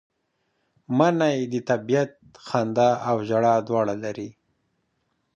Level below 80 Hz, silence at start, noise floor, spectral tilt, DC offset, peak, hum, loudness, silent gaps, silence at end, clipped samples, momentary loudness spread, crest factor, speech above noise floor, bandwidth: -66 dBFS; 0.9 s; -73 dBFS; -6.5 dB/octave; under 0.1%; -4 dBFS; none; -23 LUFS; none; 1.05 s; under 0.1%; 10 LU; 20 dB; 51 dB; 9 kHz